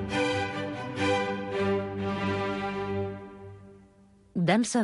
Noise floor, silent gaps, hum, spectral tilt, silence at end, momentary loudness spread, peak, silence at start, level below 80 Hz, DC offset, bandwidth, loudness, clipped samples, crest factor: -58 dBFS; none; none; -5 dB/octave; 0 s; 17 LU; -12 dBFS; 0 s; -54 dBFS; under 0.1%; 11.5 kHz; -29 LUFS; under 0.1%; 18 dB